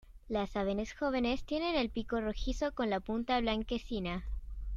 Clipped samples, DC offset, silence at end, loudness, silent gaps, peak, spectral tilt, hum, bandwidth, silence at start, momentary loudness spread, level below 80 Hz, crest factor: under 0.1%; under 0.1%; 0 s; -35 LUFS; none; -18 dBFS; -5.5 dB/octave; none; 7.6 kHz; 0.05 s; 6 LU; -44 dBFS; 18 dB